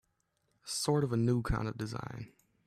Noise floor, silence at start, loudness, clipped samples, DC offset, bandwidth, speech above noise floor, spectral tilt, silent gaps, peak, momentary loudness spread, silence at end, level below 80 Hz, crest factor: -78 dBFS; 0.65 s; -33 LUFS; under 0.1%; under 0.1%; 13.5 kHz; 45 dB; -5.5 dB/octave; none; -18 dBFS; 18 LU; 0.4 s; -50 dBFS; 16 dB